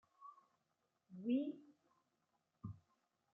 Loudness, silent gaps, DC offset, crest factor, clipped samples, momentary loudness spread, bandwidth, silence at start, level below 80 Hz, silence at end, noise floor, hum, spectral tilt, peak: -44 LUFS; none; under 0.1%; 20 dB; under 0.1%; 21 LU; 3.9 kHz; 0.2 s; -82 dBFS; 0.55 s; -86 dBFS; none; -7.5 dB/octave; -30 dBFS